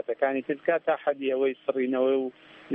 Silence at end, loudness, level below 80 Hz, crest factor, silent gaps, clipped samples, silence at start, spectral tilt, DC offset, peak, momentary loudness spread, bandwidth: 0 s; -27 LUFS; -82 dBFS; 16 dB; none; under 0.1%; 0.1 s; -8 dB/octave; under 0.1%; -10 dBFS; 4 LU; 3.8 kHz